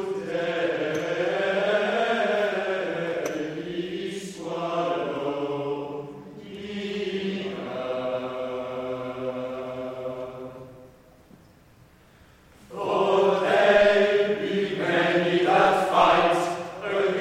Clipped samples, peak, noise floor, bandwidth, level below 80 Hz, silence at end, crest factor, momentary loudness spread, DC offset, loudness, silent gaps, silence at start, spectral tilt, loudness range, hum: under 0.1%; -6 dBFS; -54 dBFS; 14 kHz; -60 dBFS; 0 s; 20 dB; 15 LU; under 0.1%; -25 LUFS; none; 0 s; -5 dB/octave; 14 LU; none